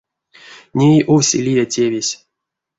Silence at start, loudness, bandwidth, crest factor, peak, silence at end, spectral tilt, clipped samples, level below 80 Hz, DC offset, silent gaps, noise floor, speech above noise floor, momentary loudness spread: 0.5 s; -15 LUFS; 8 kHz; 14 dB; -2 dBFS; 0.65 s; -5 dB/octave; under 0.1%; -54 dBFS; under 0.1%; none; -80 dBFS; 66 dB; 11 LU